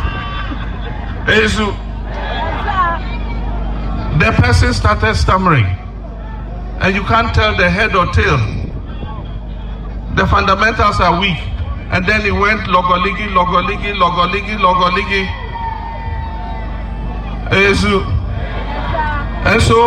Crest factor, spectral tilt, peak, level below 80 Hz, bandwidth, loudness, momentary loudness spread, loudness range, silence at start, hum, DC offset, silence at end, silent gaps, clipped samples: 14 dB; -5.5 dB/octave; 0 dBFS; -22 dBFS; 10.5 kHz; -15 LUFS; 13 LU; 4 LU; 0 s; none; under 0.1%; 0 s; none; under 0.1%